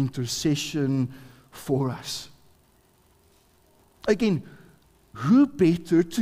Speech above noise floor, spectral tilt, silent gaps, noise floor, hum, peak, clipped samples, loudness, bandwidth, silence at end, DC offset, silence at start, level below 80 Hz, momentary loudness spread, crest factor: 38 dB; -6 dB/octave; none; -61 dBFS; none; -8 dBFS; under 0.1%; -25 LUFS; 16 kHz; 0 s; under 0.1%; 0 s; -58 dBFS; 14 LU; 18 dB